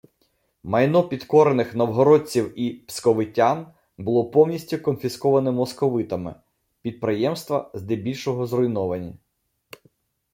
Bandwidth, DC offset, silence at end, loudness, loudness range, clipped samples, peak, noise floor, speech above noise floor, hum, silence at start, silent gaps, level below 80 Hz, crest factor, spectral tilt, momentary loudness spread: 16.5 kHz; under 0.1%; 1.15 s; -22 LUFS; 6 LU; under 0.1%; -4 dBFS; -71 dBFS; 49 dB; none; 0.65 s; none; -62 dBFS; 18 dB; -6.5 dB/octave; 12 LU